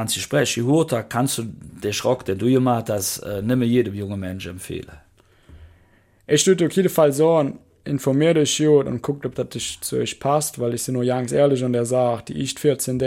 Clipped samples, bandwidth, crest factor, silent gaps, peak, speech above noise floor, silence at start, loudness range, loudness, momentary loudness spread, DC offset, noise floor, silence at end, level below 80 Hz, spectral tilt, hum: under 0.1%; 16.5 kHz; 16 dB; none; -4 dBFS; 36 dB; 0 s; 5 LU; -21 LUFS; 11 LU; under 0.1%; -56 dBFS; 0 s; -52 dBFS; -5 dB/octave; none